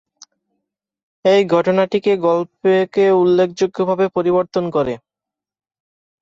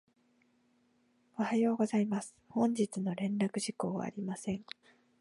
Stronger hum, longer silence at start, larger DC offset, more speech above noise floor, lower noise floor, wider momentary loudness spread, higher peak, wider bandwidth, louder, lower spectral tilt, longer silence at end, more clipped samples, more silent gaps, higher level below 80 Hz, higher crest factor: neither; about the same, 1.25 s vs 1.35 s; neither; first, 72 dB vs 38 dB; first, -87 dBFS vs -72 dBFS; second, 6 LU vs 10 LU; first, -4 dBFS vs -18 dBFS; second, 7.6 kHz vs 11.5 kHz; first, -16 LUFS vs -34 LUFS; about the same, -6.5 dB/octave vs -6 dB/octave; first, 1.25 s vs 0.6 s; neither; neither; first, -58 dBFS vs -76 dBFS; about the same, 14 dB vs 18 dB